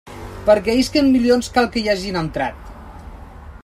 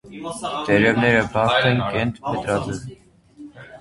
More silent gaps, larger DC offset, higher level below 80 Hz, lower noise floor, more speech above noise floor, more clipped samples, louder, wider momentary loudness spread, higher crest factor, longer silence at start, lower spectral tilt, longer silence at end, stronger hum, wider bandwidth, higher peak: neither; neither; first, -38 dBFS vs -46 dBFS; second, -37 dBFS vs -44 dBFS; second, 20 dB vs 24 dB; neither; about the same, -18 LUFS vs -20 LUFS; first, 23 LU vs 16 LU; about the same, 18 dB vs 20 dB; about the same, 0.05 s vs 0.05 s; about the same, -5 dB/octave vs -5.5 dB/octave; about the same, 0.05 s vs 0 s; neither; first, 14 kHz vs 11.5 kHz; about the same, -2 dBFS vs -2 dBFS